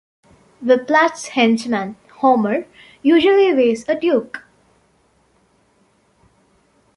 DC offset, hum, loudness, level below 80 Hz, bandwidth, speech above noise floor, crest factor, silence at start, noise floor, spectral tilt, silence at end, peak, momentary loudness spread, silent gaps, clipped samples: under 0.1%; none; -16 LUFS; -64 dBFS; 11.5 kHz; 43 dB; 18 dB; 0.6 s; -59 dBFS; -4.5 dB/octave; 2.6 s; -2 dBFS; 12 LU; none; under 0.1%